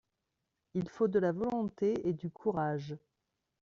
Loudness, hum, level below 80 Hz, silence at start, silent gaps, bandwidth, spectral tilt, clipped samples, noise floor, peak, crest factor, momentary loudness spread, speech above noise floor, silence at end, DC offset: -34 LUFS; none; -68 dBFS; 0.75 s; none; 7.2 kHz; -8 dB/octave; under 0.1%; -85 dBFS; -18 dBFS; 18 dB; 10 LU; 52 dB; 0.65 s; under 0.1%